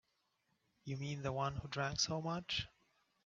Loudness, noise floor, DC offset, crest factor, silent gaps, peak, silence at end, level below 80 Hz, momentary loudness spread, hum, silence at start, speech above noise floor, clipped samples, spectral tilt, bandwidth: -40 LUFS; -82 dBFS; under 0.1%; 22 dB; none; -22 dBFS; 0.55 s; -64 dBFS; 11 LU; none; 0.85 s; 41 dB; under 0.1%; -3.5 dB/octave; 7.8 kHz